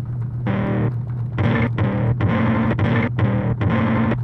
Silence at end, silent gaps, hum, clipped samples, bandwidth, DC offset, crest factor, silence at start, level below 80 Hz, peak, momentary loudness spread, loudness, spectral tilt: 0 s; none; none; under 0.1%; 4.4 kHz; under 0.1%; 12 dB; 0 s; -38 dBFS; -6 dBFS; 5 LU; -20 LUFS; -10 dB/octave